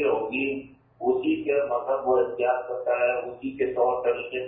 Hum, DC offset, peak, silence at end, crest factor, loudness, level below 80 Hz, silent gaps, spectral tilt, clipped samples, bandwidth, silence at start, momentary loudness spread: none; under 0.1%; -10 dBFS; 0 s; 14 dB; -26 LUFS; -62 dBFS; none; -9.5 dB/octave; under 0.1%; 3.8 kHz; 0 s; 6 LU